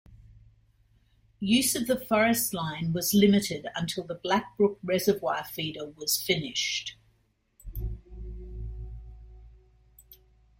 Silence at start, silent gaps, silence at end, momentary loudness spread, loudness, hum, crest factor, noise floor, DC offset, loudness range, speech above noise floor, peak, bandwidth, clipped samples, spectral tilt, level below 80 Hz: 0.1 s; none; 0.45 s; 19 LU; -27 LUFS; none; 20 dB; -69 dBFS; under 0.1%; 15 LU; 42 dB; -10 dBFS; 16.5 kHz; under 0.1%; -4 dB/octave; -46 dBFS